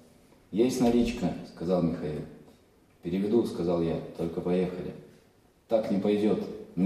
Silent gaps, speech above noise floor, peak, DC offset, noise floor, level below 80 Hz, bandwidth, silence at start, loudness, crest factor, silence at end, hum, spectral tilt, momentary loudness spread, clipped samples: none; 34 dB; -12 dBFS; under 0.1%; -62 dBFS; -54 dBFS; 14 kHz; 0.5 s; -29 LUFS; 16 dB; 0 s; none; -7 dB/octave; 13 LU; under 0.1%